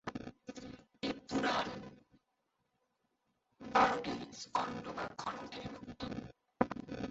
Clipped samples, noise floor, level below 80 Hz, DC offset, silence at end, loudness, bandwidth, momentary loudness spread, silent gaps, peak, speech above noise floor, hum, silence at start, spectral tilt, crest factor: under 0.1%; -83 dBFS; -66 dBFS; under 0.1%; 0 s; -38 LUFS; 8 kHz; 18 LU; none; -10 dBFS; 41 dB; none; 0.05 s; -3 dB/octave; 30 dB